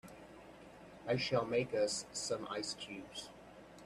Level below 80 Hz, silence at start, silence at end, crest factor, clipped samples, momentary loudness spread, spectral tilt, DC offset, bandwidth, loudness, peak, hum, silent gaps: -70 dBFS; 0.05 s; 0 s; 20 dB; under 0.1%; 21 LU; -3.5 dB/octave; under 0.1%; 13.5 kHz; -38 LUFS; -20 dBFS; none; none